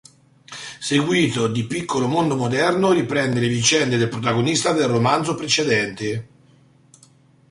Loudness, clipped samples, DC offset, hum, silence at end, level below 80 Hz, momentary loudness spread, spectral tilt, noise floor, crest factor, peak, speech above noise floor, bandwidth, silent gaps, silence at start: -19 LUFS; under 0.1%; under 0.1%; none; 1.25 s; -56 dBFS; 10 LU; -4.5 dB/octave; -53 dBFS; 18 dB; -4 dBFS; 34 dB; 11.5 kHz; none; 0.5 s